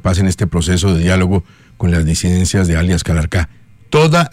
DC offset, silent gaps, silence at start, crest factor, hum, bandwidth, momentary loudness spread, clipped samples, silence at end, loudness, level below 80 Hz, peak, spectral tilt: under 0.1%; none; 0.05 s; 12 dB; none; 15 kHz; 6 LU; under 0.1%; 0.05 s; -14 LUFS; -30 dBFS; -2 dBFS; -5.5 dB/octave